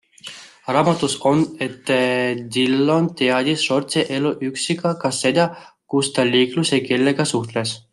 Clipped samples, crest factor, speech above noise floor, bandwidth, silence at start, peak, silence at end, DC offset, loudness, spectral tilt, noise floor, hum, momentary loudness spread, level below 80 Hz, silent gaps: under 0.1%; 18 dB; 20 dB; 12.5 kHz; 0.25 s; -2 dBFS; 0.15 s; under 0.1%; -19 LUFS; -4.5 dB/octave; -39 dBFS; none; 7 LU; -62 dBFS; none